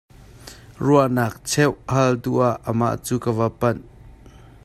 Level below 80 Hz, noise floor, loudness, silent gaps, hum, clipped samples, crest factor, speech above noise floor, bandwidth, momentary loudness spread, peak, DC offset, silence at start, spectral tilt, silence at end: -48 dBFS; -45 dBFS; -21 LUFS; none; none; under 0.1%; 18 dB; 25 dB; 14.5 kHz; 12 LU; -4 dBFS; under 0.1%; 0.45 s; -6 dB/octave; 0.55 s